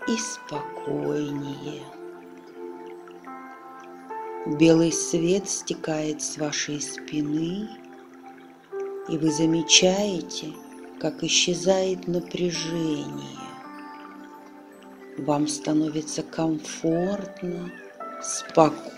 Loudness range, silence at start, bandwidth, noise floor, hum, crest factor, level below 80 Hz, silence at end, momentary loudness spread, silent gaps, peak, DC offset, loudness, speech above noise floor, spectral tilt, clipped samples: 10 LU; 0 s; 14 kHz; -46 dBFS; none; 24 dB; -62 dBFS; 0 s; 22 LU; none; -2 dBFS; under 0.1%; -25 LUFS; 22 dB; -3.5 dB/octave; under 0.1%